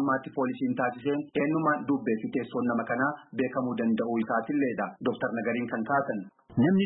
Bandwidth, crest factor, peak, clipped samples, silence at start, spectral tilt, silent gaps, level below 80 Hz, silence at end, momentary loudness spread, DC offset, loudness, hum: 4 kHz; 14 dB; -14 dBFS; under 0.1%; 0 s; -11 dB/octave; none; -68 dBFS; 0 s; 5 LU; under 0.1%; -29 LUFS; none